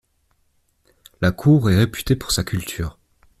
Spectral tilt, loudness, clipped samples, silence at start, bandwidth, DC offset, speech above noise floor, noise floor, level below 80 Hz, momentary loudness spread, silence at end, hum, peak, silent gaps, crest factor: -5.5 dB/octave; -20 LUFS; under 0.1%; 1.2 s; 15.5 kHz; under 0.1%; 46 dB; -65 dBFS; -40 dBFS; 13 LU; 0.5 s; none; -4 dBFS; none; 18 dB